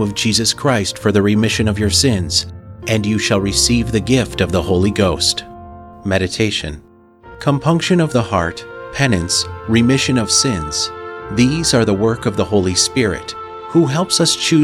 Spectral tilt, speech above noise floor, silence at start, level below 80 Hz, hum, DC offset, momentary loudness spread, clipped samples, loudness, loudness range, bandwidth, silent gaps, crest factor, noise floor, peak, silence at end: -4 dB/octave; 26 dB; 0 s; -36 dBFS; none; under 0.1%; 10 LU; under 0.1%; -15 LUFS; 3 LU; 16.5 kHz; none; 14 dB; -41 dBFS; -2 dBFS; 0 s